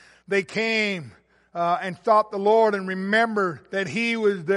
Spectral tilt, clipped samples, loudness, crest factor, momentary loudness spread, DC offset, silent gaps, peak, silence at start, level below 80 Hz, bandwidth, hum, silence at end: -5 dB/octave; under 0.1%; -23 LUFS; 16 dB; 8 LU; under 0.1%; none; -6 dBFS; 0.3 s; -70 dBFS; 11.5 kHz; none; 0 s